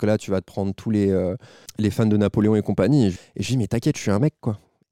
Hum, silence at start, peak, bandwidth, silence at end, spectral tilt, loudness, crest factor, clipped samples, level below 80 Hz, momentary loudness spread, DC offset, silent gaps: none; 0 s; -8 dBFS; 15 kHz; 0.35 s; -7 dB/octave; -22 LUFS; 14 dB; under 0.1%; -52 dBFS; 11 LU; 0.2%; none